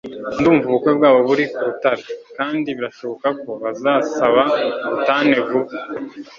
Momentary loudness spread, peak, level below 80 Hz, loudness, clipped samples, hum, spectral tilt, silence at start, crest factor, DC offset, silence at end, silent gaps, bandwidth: 12 LU; -2 dBFS; -56 dBFS; -18 LUFS; under 0.1%; none; -6 dB/octave; 0.05 s; 16 dB; under 0.1%; 0.05 s; none; 7.4 kHz